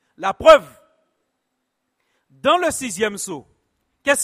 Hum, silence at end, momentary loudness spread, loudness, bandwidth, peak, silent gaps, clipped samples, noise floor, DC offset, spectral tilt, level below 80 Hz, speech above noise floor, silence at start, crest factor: none; 0 s; 17 LU; -17 LUFS; 15.5 kHz; 0 dBFS; none; under 0.1%; -75 dBFS; under 0.1%; -2 dB/octave; -50 dBFS; 58 dB; 0.2 s; 20 dB